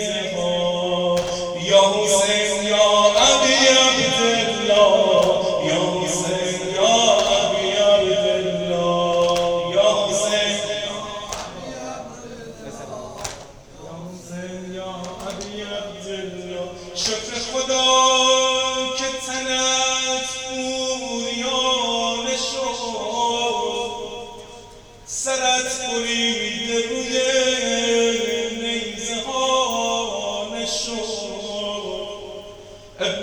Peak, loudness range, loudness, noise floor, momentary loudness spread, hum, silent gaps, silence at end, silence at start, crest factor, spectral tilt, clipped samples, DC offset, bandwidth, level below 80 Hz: -2 dBFS; 16 LU; -19 LUFS; -43 dBFS; 18 LU; none; none; 0 s; 0 s; 20 dB; -2 dB/octave; under 0.1%; under 0.1%; 20 kHz; -50 dBFS